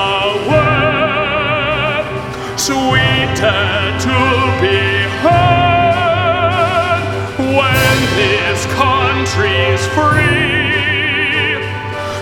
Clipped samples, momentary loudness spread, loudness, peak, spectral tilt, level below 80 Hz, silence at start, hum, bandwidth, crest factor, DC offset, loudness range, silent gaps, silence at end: under 0.1%; 5 LU; -13 LUFS; 0 dBFS; -4.5 dB/octave; -34 dBFS; 0 s; none; 17 kHz; 14 dB; under 0.1%; 2 LU; none; 0 s